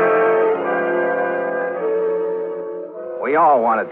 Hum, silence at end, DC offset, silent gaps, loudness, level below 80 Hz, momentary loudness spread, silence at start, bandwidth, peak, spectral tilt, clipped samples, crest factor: none; 0 s; under 0.1%; none; -18 LUFS; -74 dBFS; 13 LU; 0 s; 3.9 kHz; -4 dBFS; -8.5 dB/octave; under 0.1%; 14 dB